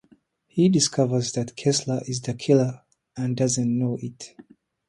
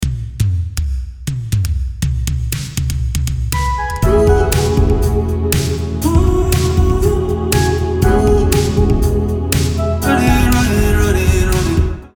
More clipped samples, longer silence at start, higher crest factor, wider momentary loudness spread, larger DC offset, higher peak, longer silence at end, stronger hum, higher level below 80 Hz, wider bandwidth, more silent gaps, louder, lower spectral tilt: neither; first, 0.55 s vs 0 s; about the same, 18 dB vs 14 dB; first, 16 LU vs 7 LU; neither; second, -6 dBFS vs 0 dBFS; first, 0.6 s vs 0.1 s; neither; second, -62 dBFS vs -18 dBFS; second, 11.5 kHz vs over 20 kHz; neither; second, -23 LUFS vs -15 LUFS; about the same, -5.5 dB/octave vs -6 dB/octave